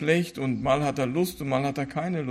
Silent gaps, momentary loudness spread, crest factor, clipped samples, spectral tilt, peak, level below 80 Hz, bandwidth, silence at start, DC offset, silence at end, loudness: none; 5 LU; 16 dB; under 0.1%; -6 dB/octave; -10 dBFS; -54 dBFS; 15.5 kHz; 0 s; under 0.1%; 0 s; -27 LUFS